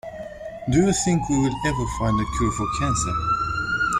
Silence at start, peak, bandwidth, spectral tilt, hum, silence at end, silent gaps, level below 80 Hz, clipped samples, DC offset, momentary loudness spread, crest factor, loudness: 0.05 s; -6 dBFS; 15.5 kHz; -5 dB/octave; none; 0 s; none; -36 dBFS; under 0.1%; under 0.1%; 9 LU; 16 dB; -22 LUFS